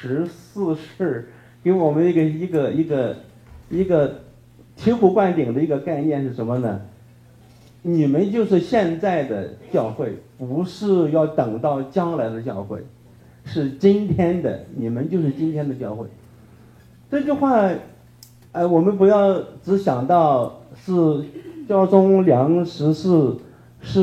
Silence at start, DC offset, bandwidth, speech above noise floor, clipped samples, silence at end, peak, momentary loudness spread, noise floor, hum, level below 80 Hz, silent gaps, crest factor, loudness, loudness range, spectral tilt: 0 s; under 0.1%; 9 kHz; 29 dB; under 0.1%; 0 s; 0 dBFS; 13 LU; -48 dBFS; none; -54 dBFS; none; 20 dB; -20 LUFS; 4 LU; -9 dB/octave